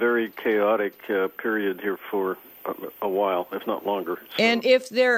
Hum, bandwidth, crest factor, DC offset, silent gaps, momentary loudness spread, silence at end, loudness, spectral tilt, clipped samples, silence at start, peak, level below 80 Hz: none; 15.5 kHz; 18 dB; under 0.1%; none; 10 LU; 0 s; -25 LUFS; -4.5 dB/octave; under 0.1%; 0 s; -6 dBFS; -74 dBFS